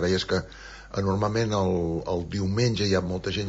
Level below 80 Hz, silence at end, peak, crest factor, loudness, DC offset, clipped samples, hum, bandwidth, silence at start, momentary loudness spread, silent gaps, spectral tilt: -46 dBFS; 0 s; -12 dBFS; 14 dB; -26 LUFS; under 0.1%; under 0.1%; none; 8 kHz; 0 s; 5 LU; none; -6 dB/octave